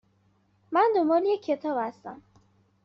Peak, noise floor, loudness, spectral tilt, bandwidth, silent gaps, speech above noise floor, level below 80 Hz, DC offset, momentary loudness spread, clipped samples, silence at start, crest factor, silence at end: -12 dBFS; -66 dBFS; -26 LUFS; -3 dB/octave; 6.6 kHz; none; 41 dB; -76 dBFS; under 0.1%; 16 LU; under 0.1%; 0.7 s; 16 dB; 0.7 s